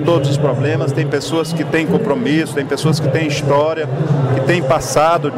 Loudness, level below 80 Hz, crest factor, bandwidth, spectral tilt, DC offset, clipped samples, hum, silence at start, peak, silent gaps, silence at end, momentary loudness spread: -16 LUFS; -48 dBFS; 10 dB; 15 kHz; -6 dB/octave; under 0.1%; under 0.1%; none; 0 s; -4 dBFS; none; 0 s; 4 LU